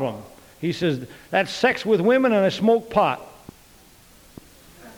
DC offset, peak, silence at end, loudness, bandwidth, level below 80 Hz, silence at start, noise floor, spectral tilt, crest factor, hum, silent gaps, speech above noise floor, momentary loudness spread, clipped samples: under 0.1%; -6 dBFS; 0.05 s; -21 LUFS; 20 kHz; -56 dBFS; 0 s; -51 dBFS; -6 dB/octave; 18 dB; none; none; 30 dB; 12 LU; under 0.1%